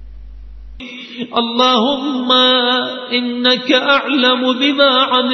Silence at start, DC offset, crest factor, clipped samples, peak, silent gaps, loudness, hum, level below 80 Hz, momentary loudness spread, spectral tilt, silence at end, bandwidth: 0 s; under 0.1%; 14 dB; under 0.1%; 0 dBFS; none; -13 LUFS; none; -42 dBFS; 14 LU; -3.5 dB/octave; 0 s; 6.2 kHz